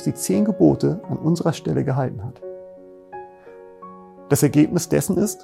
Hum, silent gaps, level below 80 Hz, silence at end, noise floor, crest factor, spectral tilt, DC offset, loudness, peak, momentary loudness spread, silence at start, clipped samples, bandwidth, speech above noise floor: none; none; -52 dBFS; 0 s; -43 dBFS; 18 dB; -6.5 dB/octave; under 0.1%; -20 LUFS; -2 dBFS; 23 LU; 0 s; under 0.1%; 16.5 kHz; 23 dB